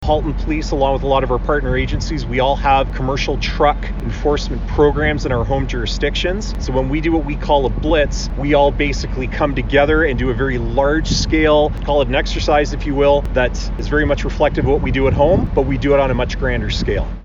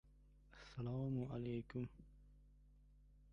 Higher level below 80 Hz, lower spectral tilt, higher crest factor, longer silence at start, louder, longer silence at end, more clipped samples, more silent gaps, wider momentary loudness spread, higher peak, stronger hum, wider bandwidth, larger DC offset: first, -22 dBFS vs -66 dBFS; second, -6 dB/octave vs -9 dB/octave; about the same, 14 dB vs 16 dB; about the same, 0 s vs 0.05 s; first, -17 LUFS vs -47 LUFS; about the same, 0 s vs 0 s; neither; neither; second, 6 LU vs 23 LU; first, -2 dBFS vs -32 dBFS; second, none vs 50 Hz at -65 dBFS; first, 7.6 kHz vs 6.8 kHz; neither